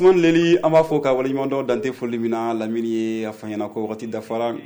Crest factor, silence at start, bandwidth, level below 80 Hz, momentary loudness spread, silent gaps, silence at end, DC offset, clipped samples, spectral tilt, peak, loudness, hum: 14 dB; 0 s; over 20 kHz; -58 dBFS; 12 LU; none; 0 s; under 0.1%; under 0.1%; -6.5 dB/octave; -6 dBFS; -21 LUFS; none